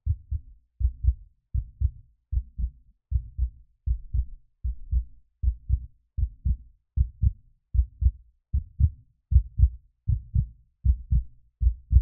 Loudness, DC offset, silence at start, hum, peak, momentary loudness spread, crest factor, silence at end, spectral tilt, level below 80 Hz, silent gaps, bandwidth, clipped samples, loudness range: -30 LUFS; under 0.1%; 0.05 s; none; -6 dBFS; 11 LU; 20 dB; 0 s; -27.5 dB/octave; -28 dBFS; none; 0.3 kHz; under 0.1%; 6 LU